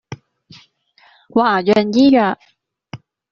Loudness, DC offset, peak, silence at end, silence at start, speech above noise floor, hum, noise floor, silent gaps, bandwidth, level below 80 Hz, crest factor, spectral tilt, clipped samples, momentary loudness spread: -14 LUFS; under 0.1%; -2 dBFS; 0.35 s; 0.1 s; 40 dB; none; -53 dBFS; none; 7.2 kHz; -58 dBFS; 16 dB; -4 dB/octave; under 0.1%; 26 LU